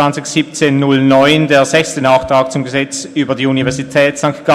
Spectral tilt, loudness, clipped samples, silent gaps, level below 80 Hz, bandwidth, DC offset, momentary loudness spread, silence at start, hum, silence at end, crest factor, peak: -5 dB/octave; -12 LUFS; under 0.1%; none; -46 dBFS; 13.5 kHz; under 0.1%; 8 LU; 0 s; none; 0 s; 12 dB; 0 dBFS